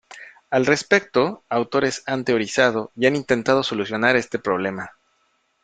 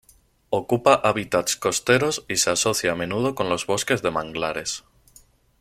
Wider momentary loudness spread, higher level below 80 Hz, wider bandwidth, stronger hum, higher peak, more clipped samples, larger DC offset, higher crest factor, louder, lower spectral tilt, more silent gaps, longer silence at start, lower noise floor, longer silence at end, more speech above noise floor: about the same, 7 LU vs 8 LU; second, -60 dBFS vs -54 dBFS; second, 9.4 kHz vs 16 kHz; neither; about the same, -2 dBFS vs -2 dBFS; neither; neither; about the same, 20 dB vs 20 dB; about the same, -21 LUFS vs -22 LUFS; first, -4.5 dB/octave vs -3 dB/octave; neither; second, 0.1 s vs 0.5 s; first, -67 dBFS vs -55 dBFS; about the same, 0.75 s vs 0.8 s; first, 46 dB vs 33 dB